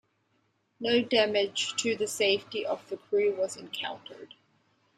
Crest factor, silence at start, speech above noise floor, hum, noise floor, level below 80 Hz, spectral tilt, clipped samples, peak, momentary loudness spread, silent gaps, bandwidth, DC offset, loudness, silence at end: 22 dB; 0.8 s; 44 dB; none; -73 dBFS; -74 dBFS; -2.5 dB/octave; under 0.1%; -8 dBFS; 12 LU; none; 14 kHz; under 0.1%; -29 LUFS; 0.7 s